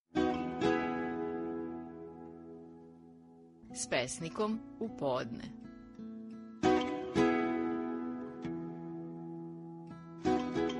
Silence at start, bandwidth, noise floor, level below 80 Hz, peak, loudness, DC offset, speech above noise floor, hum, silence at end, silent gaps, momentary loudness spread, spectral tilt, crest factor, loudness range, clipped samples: 0.15 s; 10.5 kHz; -58 dBFS; -62 dBFS; -16 dBFS; -36 LUFS; under 0.1%; 21 dB; none; 0 s; none; 19 LU; -5 dB/octave; 20 dB; 6 LU; under 0.1%